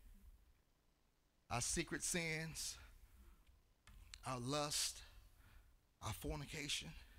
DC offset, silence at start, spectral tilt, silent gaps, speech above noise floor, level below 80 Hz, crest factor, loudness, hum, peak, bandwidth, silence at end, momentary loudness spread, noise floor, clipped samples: under 0.1%; 0 s; -2.5 dB/octave; none; 34 dB; -62 dBFS; 20 dB; -44 LUFS; none; -28 dBFS; 16 kHz; 0 s; 13 LU; -78 dBFS; under 0.1%